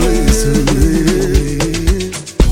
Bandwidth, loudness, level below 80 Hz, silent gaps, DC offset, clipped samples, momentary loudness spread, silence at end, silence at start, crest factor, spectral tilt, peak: 17 kHz; -14 LUFS; -16 dBFS; none; under 0.1%; under 0.1%; 4 LU; 0 s; 0 s; 12 dB; -5.5 dB/octave; 0 dBFS